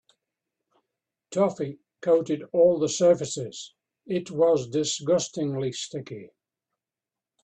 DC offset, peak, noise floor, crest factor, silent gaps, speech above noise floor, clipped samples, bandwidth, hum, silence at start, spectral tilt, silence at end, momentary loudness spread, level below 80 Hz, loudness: under 0.1%; -10 dBFS; under -90 dBFS; 18 dB; none; over 65 dB; under 0.1%; 9 kHz; none; 1.3 s; -5 dB/octave; 1.15 s; 15 LU; -68 dBFS; -25 LUFS